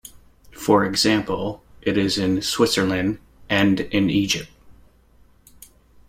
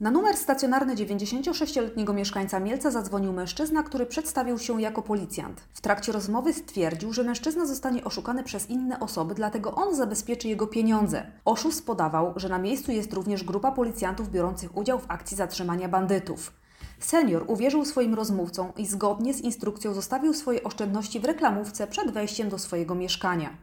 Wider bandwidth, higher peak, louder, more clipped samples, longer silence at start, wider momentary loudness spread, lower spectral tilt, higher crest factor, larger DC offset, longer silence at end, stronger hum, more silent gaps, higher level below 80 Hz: about the same, 16.5 kHz vs 18 kHz; first, -4 dBFS vs -8 dBFS; first, -21 LUFS vs -28 LUFS; neither; about the same, 0.05 s vs 0 s; first, 10 LU vs 6 LU; about the same, -4.5 dB/octave vs -4.5 dB/octave; about the same, 20 dB vs 20 dB; neither; first, 1.35 s vs 0 s; neither; neither; about the same, -50 dBFS vs -52 dBFS